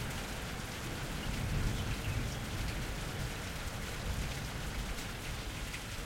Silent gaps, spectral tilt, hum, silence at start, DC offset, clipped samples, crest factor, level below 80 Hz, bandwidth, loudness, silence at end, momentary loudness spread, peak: none; -4 dB/octave; none; 0 s; under 0.1%; under 0.1%; 16 dB; -42 dBFS; 16.5 kHz; -39 LUFS; 0 s; 4 LU; -22 dBFS